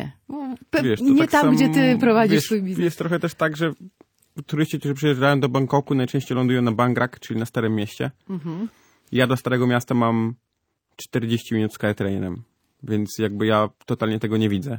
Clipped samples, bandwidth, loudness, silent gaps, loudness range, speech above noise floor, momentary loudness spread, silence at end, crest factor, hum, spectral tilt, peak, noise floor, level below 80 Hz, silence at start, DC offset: under 0.1%; 19 kHz; -21 LUFS; none; 6 LU; 53 dB; 14 LU; 0 s; 18 dB; none; -6.5 dB/octave; -4 dBFS; -74 dBFS; -60 dBFS; 0 s; under 0.1%